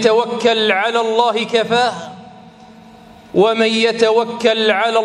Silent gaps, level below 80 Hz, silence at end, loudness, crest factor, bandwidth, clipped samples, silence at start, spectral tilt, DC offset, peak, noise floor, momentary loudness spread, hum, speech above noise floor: none; -60 dBFS; 0 s; -15 LUFS; 16 dB; 11 kHz; under 0.1%; 0 s; -3.5 dB/octave; under 0.1%; 0 dBFS; -41 dBFS; 4 LU; none; 26 dB